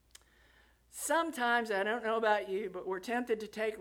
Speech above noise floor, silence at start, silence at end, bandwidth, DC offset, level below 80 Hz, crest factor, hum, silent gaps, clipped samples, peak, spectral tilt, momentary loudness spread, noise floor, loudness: 32 dB; 0.95 s; 0 s; 18 kHz; under 0.1%; -70 dBFS; 20 dB; none; none; under 0.1%; -14 dBFS; -2.5 dB/octave; 8 LU; -65 dBFS; -33 LUFS